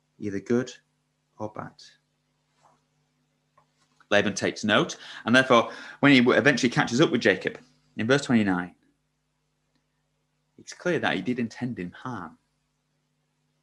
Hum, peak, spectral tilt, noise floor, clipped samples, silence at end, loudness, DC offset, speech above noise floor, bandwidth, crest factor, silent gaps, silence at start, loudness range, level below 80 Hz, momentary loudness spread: none; -4 dBFS; -5 dB/octave; -75 dBFS; under 0.1%; 1.35 s; -24 LUFS; under 0.1%; 51 dB; 11 kHz; 24 dB; none; 0.2 s; 14 LU; -64 dBFS; 20 LU